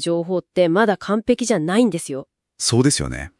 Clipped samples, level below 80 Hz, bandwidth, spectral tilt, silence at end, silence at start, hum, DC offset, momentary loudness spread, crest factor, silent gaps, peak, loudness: under 0.1%; -44 dBFS; 12 kHz; -4.5 dB/octave; 0.1 s; 0 s; none; under 0.1%; 7 LU; 16 dB; none; -4 dBFS; -19 LUFS